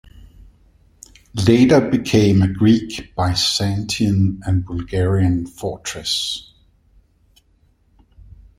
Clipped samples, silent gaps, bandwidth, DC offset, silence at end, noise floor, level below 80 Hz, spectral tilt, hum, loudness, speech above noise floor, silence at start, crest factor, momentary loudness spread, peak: under 0.1%; none; 14.5 kHz; under 0.1%; 2.15 s; -58 dBFS; -44 dBFS; -5.5 dB/octave; none; -18 LUFS; 41 dB; 1.35 s; 18 dB; 12 LU; 0 dBFS